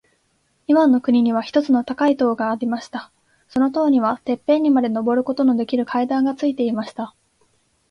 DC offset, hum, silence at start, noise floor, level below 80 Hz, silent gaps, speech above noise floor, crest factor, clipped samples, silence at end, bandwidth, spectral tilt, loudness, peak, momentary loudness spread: under 0.1%; none; 0.7 s; -65 dBFS; -64 dBFS; none; 47 dB; 16 dB; under 0.1%; 0.8 s; 6.8 kHz; -6.5 dB/octave; -19 LUFS; -4 dBFS; 11 LU